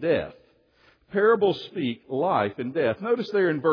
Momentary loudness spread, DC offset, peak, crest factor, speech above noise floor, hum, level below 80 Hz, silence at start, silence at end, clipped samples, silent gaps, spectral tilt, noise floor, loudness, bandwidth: 9 LU; under 0.1%; -10 dBFS; 16 dB; 37 dB; none; -62 dBFS; 0 s; 0 s; under 0.1%; none; -8 dB/octave; -61 dBFS; -25 LUFS; 5.4 kHz